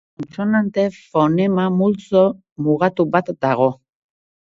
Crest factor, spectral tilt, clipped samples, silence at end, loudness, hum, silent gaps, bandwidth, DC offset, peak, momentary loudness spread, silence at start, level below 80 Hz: 18 dB; -8.5 dB/octave; under 0.1%; 0.8 s; -18 LUFS; none; 2.52-2.56 s; 7.6 kHz; under 0.1%; -2 dBFS; 5 LU; 0.2 s; -58 dBFS